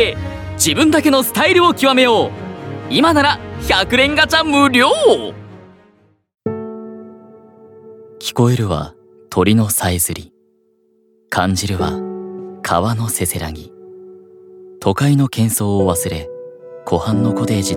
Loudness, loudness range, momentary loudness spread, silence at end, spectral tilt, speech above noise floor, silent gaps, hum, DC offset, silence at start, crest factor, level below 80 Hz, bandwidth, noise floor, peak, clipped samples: -15 LUFS; 9 LU; 17 LU; 0 s; -4.5 dB/octave; 43 dB; none; none; under 0.1%; 0 s; 16 dB; -40 dBFS; 19 kHz; -58 dBFS; 0 dBFS; under 0.1%